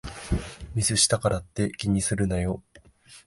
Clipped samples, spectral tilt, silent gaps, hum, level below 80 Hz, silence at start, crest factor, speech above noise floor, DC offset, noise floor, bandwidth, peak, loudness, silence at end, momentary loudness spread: under 0.1%; -4 dB/octave; none; none; -40 dBFS; 0.05 s; 20 dB; 28 dB; under 0.1%; -53 dBFS; 11.5 kHz; -8 dBFS; -25 LUFS; 0.05 s; 11 LU